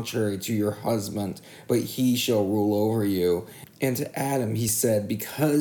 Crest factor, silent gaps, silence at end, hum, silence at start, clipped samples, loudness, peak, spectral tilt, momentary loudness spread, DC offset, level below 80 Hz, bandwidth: 14 dB; none; 0 s; none; 0 s; under 0.1%; -25 LUFS; -10 dBFS; -5 dB/octave; 7 LU; under 0.1%; -62 dBFS; 19.5 kHz